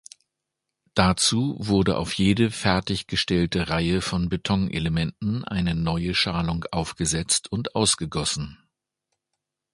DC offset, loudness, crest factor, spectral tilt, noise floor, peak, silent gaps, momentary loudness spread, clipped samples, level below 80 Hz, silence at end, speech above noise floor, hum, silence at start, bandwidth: under 0.1%; -24 LUFS; 24 dB; -4 dB/octave; -83 dBFS; 0 dBFS; none; 6 LU; under 0.1%; -42 dBFS; 1.2 s; 59 dB; none; 0.95 s; 11.5 kHz